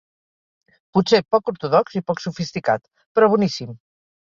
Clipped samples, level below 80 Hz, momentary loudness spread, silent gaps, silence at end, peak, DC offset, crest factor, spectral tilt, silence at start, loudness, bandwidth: under 0.1%; -60 dBFS; 9 LU; 3.06-3.15 s; 0.55 s; -2 dBFS; under 0.1%; 18 dB; -6 dB/octave; 0.95 s; -20 LUFS; 7.6 kHz